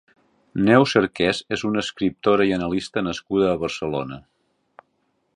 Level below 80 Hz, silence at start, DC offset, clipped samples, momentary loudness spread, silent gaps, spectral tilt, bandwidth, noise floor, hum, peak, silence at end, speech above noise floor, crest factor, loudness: -52 dBFS; 0.55 s; under 0.1%; under 0.1%; 11 LU; none; -5.5 dB/octave; 10.5 kHz; -70 dBFS; none; -2 dBFS; 1.15 s; 49 dB; 20 dB; -21 LUFS